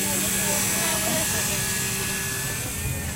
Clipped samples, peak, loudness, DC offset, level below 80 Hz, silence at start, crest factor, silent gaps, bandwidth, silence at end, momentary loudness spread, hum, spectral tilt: under 0.1%; -12 dBFS; -23 LUFS; under 0.1%; -42 dBFS; 0 s; 14 dB; none; 16 kHz; 0 s; 6 LU; none; -2 dB/octave